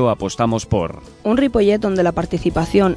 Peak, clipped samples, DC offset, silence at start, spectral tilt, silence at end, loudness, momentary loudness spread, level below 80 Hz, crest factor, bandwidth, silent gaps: -2 dBFS; under 0.1%; under 0.1%; 0 s; -6.5 dB/octave; 0 s; -18 LUFS; 6 LU; -36 dBFS; 14 dB; 11 kHz; none